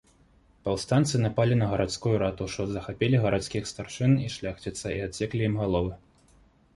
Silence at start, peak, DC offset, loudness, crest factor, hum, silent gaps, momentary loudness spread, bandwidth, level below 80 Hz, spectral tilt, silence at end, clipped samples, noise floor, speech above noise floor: 0.65 s; -10 dBFS; under 0.1%; -27 LUFS; 18 dB; none; none; 10 LU; 11.5 kHz; -48 dBFS; -6 dB/octave; 0.8 s; under 0.1%; -60 dBFS; 34 dB